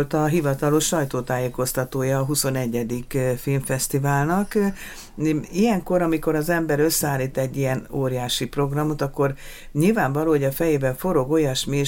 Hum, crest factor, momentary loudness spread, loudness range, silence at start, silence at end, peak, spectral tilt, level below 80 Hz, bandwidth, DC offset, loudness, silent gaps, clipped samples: none; 16 dB; 5 LU; 1 LU; 0 s; 0 s; -6 dBFS; -5 dB/octave; -42 dBFS; 17 kHz; under 0.1%; -22 LUFS; none; under 0.1%